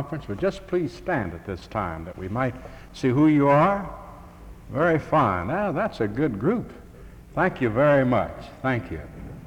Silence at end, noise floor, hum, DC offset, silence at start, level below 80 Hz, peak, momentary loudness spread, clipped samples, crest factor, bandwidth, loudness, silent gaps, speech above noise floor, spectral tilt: 0 s; -44 dBFS; none; under 0.1%; 0 s; -46 dBFS; -8 dBFS; 17 LU; under 0.1%; 16 dB; 11.5 kHz; -24 LUFS; none; 21 dB; -8 dB/octave